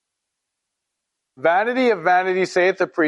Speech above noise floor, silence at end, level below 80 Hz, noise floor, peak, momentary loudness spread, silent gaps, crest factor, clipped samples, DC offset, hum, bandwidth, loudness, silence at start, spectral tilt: 62 dB; 0 s; -78 dBFS; -80 dBFS; -4 dBFS; 2 LU; none; 16 dB; under 0.1%; under 0.1%; none; 11 kHz; -19 LUFS; 1.4 s; -5 dB/octave